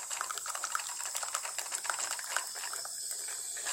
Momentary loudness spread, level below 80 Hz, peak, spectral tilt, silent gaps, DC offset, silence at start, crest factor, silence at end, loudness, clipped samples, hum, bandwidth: 3 LU; -82 dBFS; -10 dBFS; 3 dB/octave; none; under 0.1%; 0 s; 28 dB; 0 s; -35 LUFS; under 0.1%; none; 17 kHz